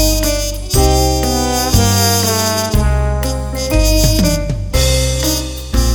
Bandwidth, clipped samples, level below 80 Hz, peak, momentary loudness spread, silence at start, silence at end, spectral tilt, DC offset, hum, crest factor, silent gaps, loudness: over 20 kHz; under 0.1%; -18 dBFS; 0 dBFS; 7 LU; 0 s; 0 s; -4 dB/octave; under 0.1%; none; 14 dB; none; -14 LUFS